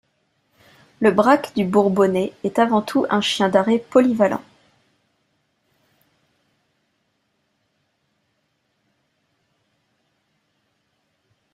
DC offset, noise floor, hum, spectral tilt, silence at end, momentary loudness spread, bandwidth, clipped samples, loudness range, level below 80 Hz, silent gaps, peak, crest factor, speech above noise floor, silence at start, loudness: under 0.1%; -70 dBFS; none; -5.5 dB/octave; 7.15 s; 4 LU; 13 kHz; under 0.1%; 6 LU; -64 dBFS; none; -2 dBFS; 20 dB; 53 dB; 1 s; -18 LUFS